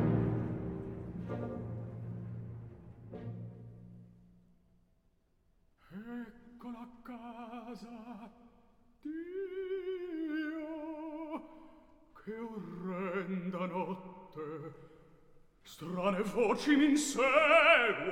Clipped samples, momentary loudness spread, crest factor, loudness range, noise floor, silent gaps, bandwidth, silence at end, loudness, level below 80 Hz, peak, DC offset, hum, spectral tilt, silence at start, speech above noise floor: under 0.1%; 23 LU; 24 dB; 19 LU; -72 dBFS; none; 16 kHz; 0 s; -33 LUFS; -62 dBFS; -12 dBFS; under 0.1%; none; -5 dB/octave; 0 s; 43 dB